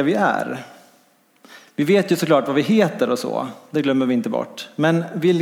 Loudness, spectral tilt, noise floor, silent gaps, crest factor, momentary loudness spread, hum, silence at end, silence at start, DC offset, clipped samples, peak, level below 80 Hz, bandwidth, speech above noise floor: -20 LUFS; -6 dB/octave; -57 dBFS; none; 16 dB; 10 LU; none; 0 s; 0 s; under 0.1%; under 0.1%; -4 dBFS; -72 dBFS; 17.5 kHz; 38 dB